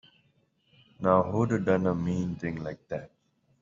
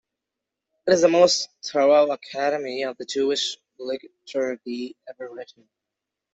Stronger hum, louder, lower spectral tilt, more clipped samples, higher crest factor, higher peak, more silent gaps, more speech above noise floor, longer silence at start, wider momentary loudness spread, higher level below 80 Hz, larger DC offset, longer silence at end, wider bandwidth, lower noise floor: neither; second, -29 LUFS vs -22 LUFS; first, -8 dB/octave vs -3 dB/octave; neither; about the same, 22 dB vs 20 dB; second, -8 dBFS vs -4 dBFS; neither; second, 42 dB vs 63 dB; first, 1 s vs 0.85 s; second, 14 LU vs 19 LU; first, -60 dBFS vs -68 dBFS; neither; second, 0.55 s vs 0.9 s; about the same, 7.6 kHz vs 8.2 kHz; second, -69 dBFS vs -85 dBFS